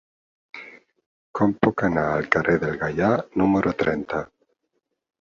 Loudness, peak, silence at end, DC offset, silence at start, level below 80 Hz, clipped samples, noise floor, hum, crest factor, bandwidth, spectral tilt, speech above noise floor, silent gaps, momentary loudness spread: -22 LUFS; -2 dBFS; 0.95 s; under 0.1%; 0.55 s; -50 dBFS; under 0.1%; -76 dBFS; none; 22 dB; 7.6 kHz; -8 dB/octave; 54 dB; 1.06-1.34 s; 20 LU